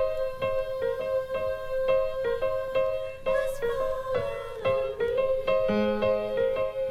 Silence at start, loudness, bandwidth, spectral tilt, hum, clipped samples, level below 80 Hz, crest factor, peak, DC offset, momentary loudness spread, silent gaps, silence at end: 0 s; -28 LUFS; 14.5 kHz; -6 dB/octave; none; under 0.1%; -46 dBFS; 14 dB; -14 dBFS; under 0.1%; 5 LU; none; 0 s